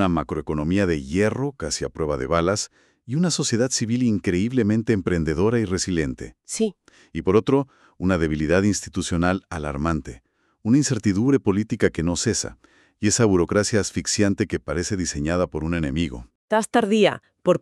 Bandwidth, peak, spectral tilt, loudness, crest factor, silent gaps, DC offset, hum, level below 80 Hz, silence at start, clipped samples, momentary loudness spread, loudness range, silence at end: 12.5 kHz; -4 dBFS; -5 dB/octave; -22 LUFS; 18 dB; 16.35-16.48 s; under 0.1%; none; -42 dBFS; 0 s; under 0.1%; 8 LU; 2 LU; 0.05 s